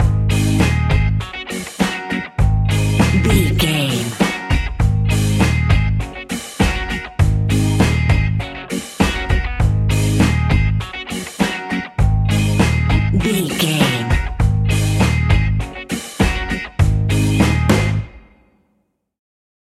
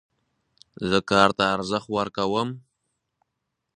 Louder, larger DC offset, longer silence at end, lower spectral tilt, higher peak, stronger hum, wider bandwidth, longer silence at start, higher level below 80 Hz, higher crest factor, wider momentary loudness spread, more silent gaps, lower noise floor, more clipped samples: first, -17 LUFS vs -23 LUFS; neither; first, 1.6 s vs 1.2 s; about the same, -5.5 dB/octave vs -5 dB/octave; about the same, -2 dBFS vs -2 dBFS; neither; first, 15 kHz vs 10.5 kHz; second, 0 s vs 0.8 s; first, -22 dBFS vs -56 dBFS; second, 14 dB vs 26 dB; second, 9 LU vs 13 LU; neither; second, -66 dBFS vs -80 dBFS; neither